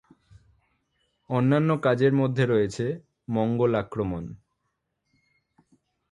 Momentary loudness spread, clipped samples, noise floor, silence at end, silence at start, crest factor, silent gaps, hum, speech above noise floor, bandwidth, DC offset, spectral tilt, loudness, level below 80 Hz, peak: 10 LU; under 0.1%; -78 dBFS; 1.75 s; 1.3 s; 18 dB; none; none; 55 dB; 10.5 kHz; under 0.1%; -8 dB/octave; -25 LUFS; -56 dBFS; -8 dBFS